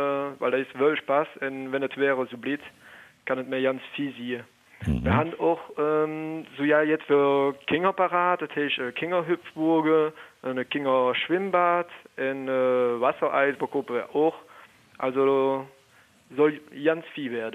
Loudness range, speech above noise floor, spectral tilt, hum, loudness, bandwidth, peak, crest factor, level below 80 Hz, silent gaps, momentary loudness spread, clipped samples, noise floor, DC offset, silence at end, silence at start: 4 LU; 33 dB; -7 dB/octave; none; -26 LUFS; 12 kHz; -8 dBFS; 18 dB; -50 dBFS; none; 10 LU; under 0.1%; -58 dBFS; under 0.1%; 0 s; 0 s